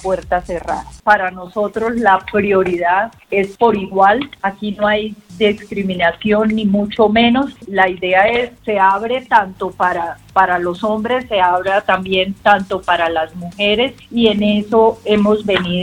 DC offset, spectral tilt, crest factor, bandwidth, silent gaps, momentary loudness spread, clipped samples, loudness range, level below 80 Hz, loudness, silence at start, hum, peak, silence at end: under 0.1%; -6 dB/octave; 16 dB; 11 kHz; none; 8 LU; under 0.1%; 2 LU; -44 dBFS; -15 LUFS; 0 s; none; 0 dBFS; 0 s